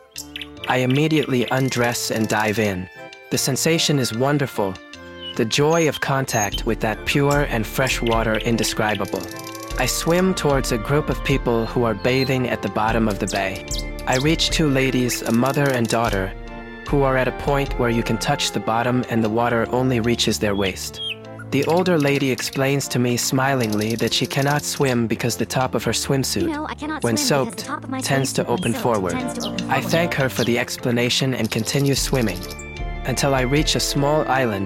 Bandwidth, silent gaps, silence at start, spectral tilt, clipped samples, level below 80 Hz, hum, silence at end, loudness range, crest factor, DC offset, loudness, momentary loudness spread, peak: 17 kHz; none; 0.15 s; -4.5 dB/octave; under 0.1%; -36 dBFS; none; 0 s; 1 LU; 16 dB; under 0.1%; -20 LUFS; 9 LU; -4 dBFS